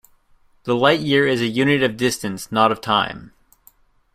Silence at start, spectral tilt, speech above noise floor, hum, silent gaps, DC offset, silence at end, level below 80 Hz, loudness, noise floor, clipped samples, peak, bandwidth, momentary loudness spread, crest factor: 0.65 s; -4.5 dB/octave; 37 dB; none; none; under 0.1%; 0.85 s; -54 dBFS; -19 LUFS; -56 dBFS; under 0.1%; -2 dBFS; 15.5 kHz; 10 LU; 18 dB